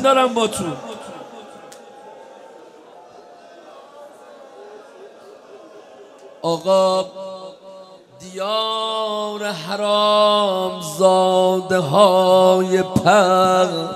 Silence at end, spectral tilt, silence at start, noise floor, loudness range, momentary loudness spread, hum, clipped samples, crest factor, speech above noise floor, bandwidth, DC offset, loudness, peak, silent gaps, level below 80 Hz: 0 s; -4.5 dB/octave; 0 s; -43 dBFS; 16 LU; 21 LU; none; under 0.1%; 20 dB; 27 dB; 14.5 kHz; under 0.1%; -17 LUFS; 0 dBFS; none; -60 dBFS